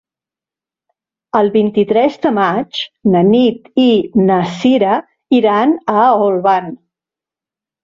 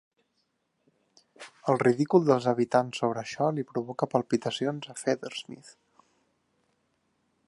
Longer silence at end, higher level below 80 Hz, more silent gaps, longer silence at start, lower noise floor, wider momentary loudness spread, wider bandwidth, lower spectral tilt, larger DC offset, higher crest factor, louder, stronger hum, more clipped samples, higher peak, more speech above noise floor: second, 1.1 s vs 1.8 s; first, -56 dBFS vs -76 dBFS; neither; about the same, 1.35 s vs 1.4 s; first, -89 dBFS vs -76 dBFS; second, 7 LU vs 14 LU; second, 7.4 kHz vs 11.5 kHz; first, -7.5 dB/octave vs -6 dB/octave; neither; second, 12 dB vs 22 dB; first, -13 LUFS vs -28 LUFS; neither; neither; first, -2 dBFS vs -8 dBFS; first, 77 dB vs 49 dB